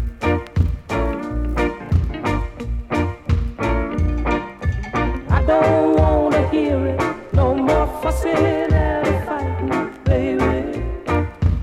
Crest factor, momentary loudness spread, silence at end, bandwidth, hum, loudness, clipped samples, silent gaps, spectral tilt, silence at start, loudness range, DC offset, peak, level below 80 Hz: 16 dB; 8 LU; 0 s; 13 kHz; none; -20 LUFS; under 0.1%; none; -8 dB/octave; 0 s; 5 LU; under 0.1%; -2 dBFS; -26 dBFS